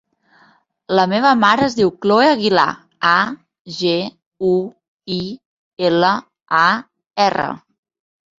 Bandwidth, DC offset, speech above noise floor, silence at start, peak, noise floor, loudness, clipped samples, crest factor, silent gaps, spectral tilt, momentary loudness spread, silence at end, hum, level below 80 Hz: 7.8 kHz; under 0.1%; 39 dB; 0.9 s; 0 dBFS; -55 dBFS; -16 LUFS; under 0.1%; 18 dB; 3.59-3.65 s, 4.26-4.31 s, 4.88-4.99 s, 5.45-5.77 s; -5 dB/octave; 16 LU; 0.8 s; none; -58 dBFS